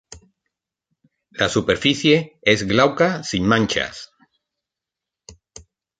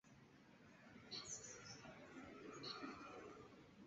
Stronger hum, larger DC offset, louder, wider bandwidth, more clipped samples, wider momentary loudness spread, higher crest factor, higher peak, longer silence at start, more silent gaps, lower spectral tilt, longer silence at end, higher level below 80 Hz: neither; neither; first, -18 LUFS vs -55 LUFS; first, 9.4 kHz vs 7.6 kHz; neither; second, 8 LU vs 16 LU; about the same, 20 dB vs 20 dB; first, -2 dBFS vs -38 dBFS; about the same, 0.1 s vs 0.05 s; neither; first, -4.5 dB/octave vs -2.5 dB/octave; first, 0.65 s vs 0 s; first, -50 dBFS vs -80 dBFS